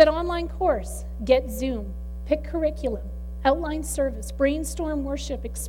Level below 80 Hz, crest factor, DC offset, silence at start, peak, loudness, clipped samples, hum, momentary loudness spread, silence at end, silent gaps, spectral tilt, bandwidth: -34 dBFS; 22 dB; under 0.1%; 0 s; -4 dBFS; -26 LUFS; under 0.1%; none; 10 LU; 0 s; none; -5 dB/octave; 17 kHz